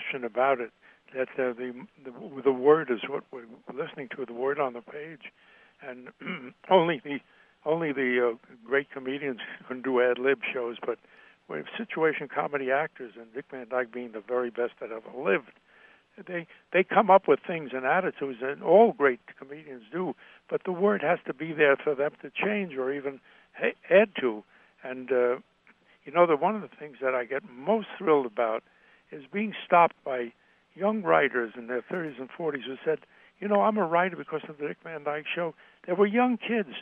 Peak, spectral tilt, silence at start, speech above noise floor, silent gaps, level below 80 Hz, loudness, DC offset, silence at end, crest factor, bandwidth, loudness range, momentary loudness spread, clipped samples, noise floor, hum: -6 dBFS; -8.5 dB/octave; 0 s; 34 dB; none; -80 dBFS; -28 LUFS; under 0.1%; 0 s; 22 dB; 4.5 kHz; 5 LU; 18 LU; under 0.1%; -62 dBFS; none